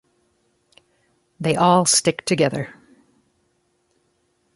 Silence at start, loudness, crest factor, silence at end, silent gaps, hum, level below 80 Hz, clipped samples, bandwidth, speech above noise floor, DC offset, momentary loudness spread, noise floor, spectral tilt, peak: 1.4 s; -18 LUFS; 22 dB; 1.85 s; none; none; -62 dBFS; under 0.1%; 12 kHz; 49 dB; under 0.1%; 14 LU; -67 dBFS; -3.5 dB/octave; -2 dBFS